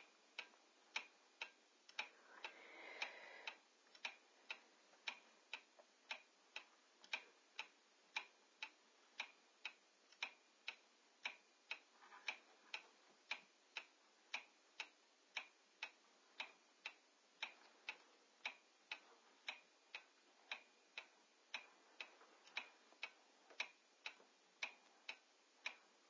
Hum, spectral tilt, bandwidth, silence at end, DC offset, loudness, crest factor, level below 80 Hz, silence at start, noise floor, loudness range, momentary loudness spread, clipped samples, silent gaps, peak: none; 1.5 dB/octave; 8 kHz; 0 s; under 0.1%; -54 LUFS; 28 dB; under -90 dBFS; 0 s; -73 dBFS; 2 LU; 13 LU; under 0.1%; none; -30 dBFS